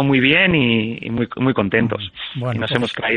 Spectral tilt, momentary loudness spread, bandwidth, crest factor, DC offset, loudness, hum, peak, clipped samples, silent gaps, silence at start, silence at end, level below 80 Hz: -7 dB/octave; 11 LU; 9.8 kHz; 18 dB; under 0.1%; -18 LUFS; none; 0 dBFS; under 0.1%; none; 0 s; 0 s; -48 dBFS